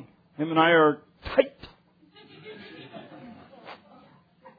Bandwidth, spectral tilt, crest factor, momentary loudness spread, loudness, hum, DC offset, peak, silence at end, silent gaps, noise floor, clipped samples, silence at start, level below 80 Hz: 5 kHz; -8.5 dB/octave; 24 dB; 28 LU; -23 LUFS; none; under 0.1%; -4 dBFS; 0.85 s; none; -57 dBFS; under 0.1%; 0.4 s; -58 dBFS